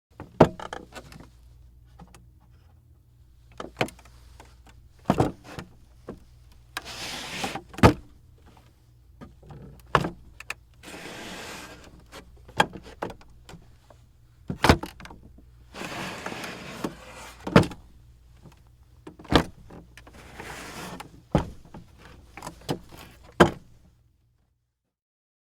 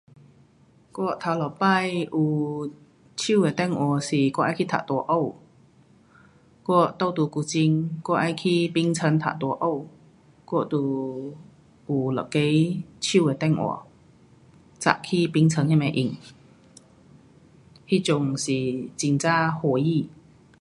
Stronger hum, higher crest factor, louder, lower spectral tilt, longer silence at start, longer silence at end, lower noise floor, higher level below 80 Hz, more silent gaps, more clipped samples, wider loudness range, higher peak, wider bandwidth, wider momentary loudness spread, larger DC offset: neither; first, 30 dB vs 24 dB; second, -27 LUFS vs -24 LUFS; about the same, -5.5 dB/octave vs -6 dB/octave; second, 0.2 s vs 0.95 s; first, 1.95 s vs 0.5 s; first, -78 dBFS vs -57 dBFS; first, -46 dBFS vs -64 dBFS; neither; neither; first, 8 LU vs 3 LU; about the same, 0 dBFS vs -2 dBFS; first, 17.5 kHz vs 11.5 kHz; first, 27 LU vs 9 LU; neither